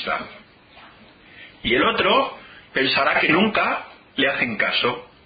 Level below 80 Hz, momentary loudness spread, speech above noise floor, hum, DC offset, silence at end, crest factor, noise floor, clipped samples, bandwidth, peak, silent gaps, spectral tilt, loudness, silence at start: -52 dBFS; 12 LU; 28 dB; none; under 0.1%; 0.2 s; 18 dB; -48 dBFS; under 0.1%; 5 kHz; -4 dBFS; none; -9 dB/octave; -20 LUFS; 0 s